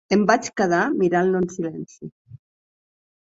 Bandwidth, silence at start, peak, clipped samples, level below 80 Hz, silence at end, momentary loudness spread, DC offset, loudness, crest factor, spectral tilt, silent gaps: 7.8 kHz; 0.1 s; -2 dBFS; under 0.1%; -60 dBFS; 0.9 s; 19 LU; under 0.1%; -21 LUFS; 20 dB; -5.5 dB/octave; 2.12-2.25 s